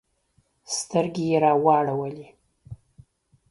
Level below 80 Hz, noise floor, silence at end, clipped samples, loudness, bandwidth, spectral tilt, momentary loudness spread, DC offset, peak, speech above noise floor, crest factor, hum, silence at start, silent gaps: -62 dBFS; -67 dBFS; 0.75 s; under 0.1%; -23 LUFS; 11.5 kHz; -5 dB/octave; 23 LU; under 0.1%; -6 dBFS; 45 dB; 20 dB; none; 0.7 s; none